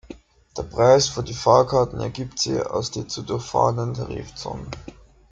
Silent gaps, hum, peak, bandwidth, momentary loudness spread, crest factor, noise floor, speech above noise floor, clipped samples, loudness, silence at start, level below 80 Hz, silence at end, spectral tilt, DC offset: none; none; -2 dBFS; 9.2 kHz; 17 LU; 20 dB; -44 dBFS; 22 dB; under 0.1%; -22 LUFS; 0.1 s; -46 dBFS; 0.4 s; -5 dB/octave; under 0.1%